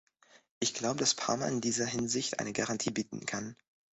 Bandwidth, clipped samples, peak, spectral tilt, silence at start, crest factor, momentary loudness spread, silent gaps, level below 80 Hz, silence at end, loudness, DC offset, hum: 8.4 kHz; under 0.1%; -12 dBFS; -3 dB/octave; 0.35 s; 22 dB; 8 LU; 0.51-0.61 s; -68 dBFS; 0.45 s; -33 LUFS; under 0.1%; none